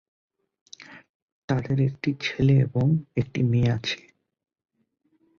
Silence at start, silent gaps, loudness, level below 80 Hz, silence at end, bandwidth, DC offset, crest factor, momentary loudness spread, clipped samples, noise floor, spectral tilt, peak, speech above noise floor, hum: 0.8 s; 1.09-1.48 s; -24 LUFS; -54 dBFS; 1.45 s; 7 kHz; under 0.1%; 16 dB; 14 LU; under 0.1%; -70 dBFS; -7.5 dB/octave; -10 dBFS; 47 dB; none